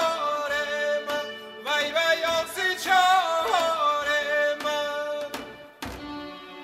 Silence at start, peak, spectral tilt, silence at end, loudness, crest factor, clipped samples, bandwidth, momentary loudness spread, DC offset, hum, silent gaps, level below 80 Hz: 0 s; -8 dBFS; -1.5 dB/octave; 0 s; -24 LUFS; 18 dB; under 0.1%; 16 kHz; 16 LU; under 0.1%; none; none; -58 dBFS